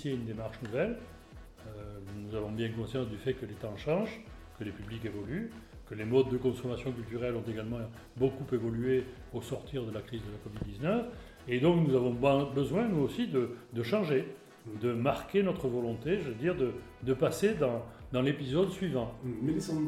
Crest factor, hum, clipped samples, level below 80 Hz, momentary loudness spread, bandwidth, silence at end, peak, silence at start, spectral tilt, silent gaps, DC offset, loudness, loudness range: 20 dB; none; under 0.1%; -54 dBFS; 15 LU; 14.5 kHz; 0 s; -14 dBFS; 0 s; -7 dB/octave; none; under 0.1%; -33 LUFS; 7 LU